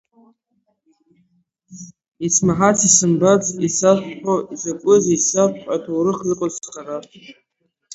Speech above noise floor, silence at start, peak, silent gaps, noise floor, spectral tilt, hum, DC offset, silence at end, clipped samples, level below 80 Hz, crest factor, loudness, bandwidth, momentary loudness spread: 51 dB; 1.7 s; 0 dBFS; 2.08-2.12 s; -68 dBFS; -4.5 dB/octave; none; under 0.1%; 0.65 s; under 0.1%; -56 dBFS; 20 dB; -17 LUFS; 8.2 kHz; 18 LU